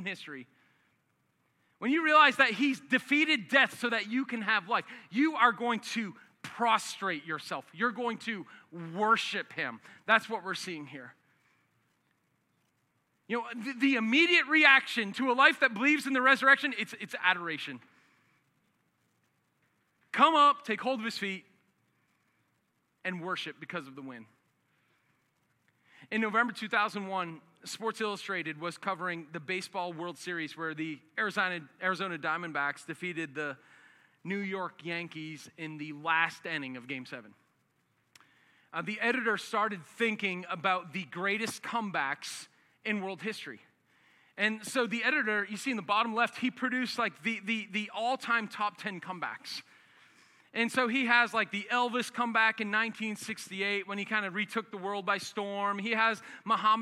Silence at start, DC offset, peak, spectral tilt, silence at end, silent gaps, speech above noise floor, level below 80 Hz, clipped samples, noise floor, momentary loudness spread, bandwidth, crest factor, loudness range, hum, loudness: 0 s; under 0.1%; -8 dBFS; -3.5 dB/octave; 0 s; none; 45 dB; under -90 dBFS; under 0.1%; -76 dBFS; 16 LU; 15 kHz; 24 dB; 10 LU; none; -30 LUFS